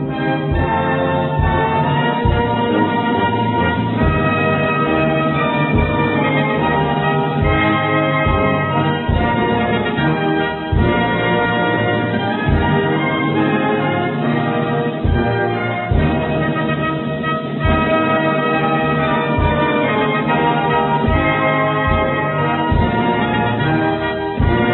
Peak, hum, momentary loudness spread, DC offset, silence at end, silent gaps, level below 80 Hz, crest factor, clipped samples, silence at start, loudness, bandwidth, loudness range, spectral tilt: -2 dBFS; none; 3 LU; under 0.1%; 0 s; none; -28 dBFS; 14 dB; under 0.1%; 0 s; -16 LUFS; 4.2 kHz; 2 LU; -10.5 dB/octave